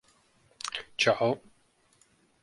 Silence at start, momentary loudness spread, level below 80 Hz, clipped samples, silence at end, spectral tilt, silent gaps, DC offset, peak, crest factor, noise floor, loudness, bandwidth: 0.65 s; 12 LU; -72 dBFS; under 0.1%; 1.05 s; -3.5 dB/octave; none; under 0.1%; -10 dBFS; 24 dB; -67 dBFS; -29 LUFS; 11.5 kHz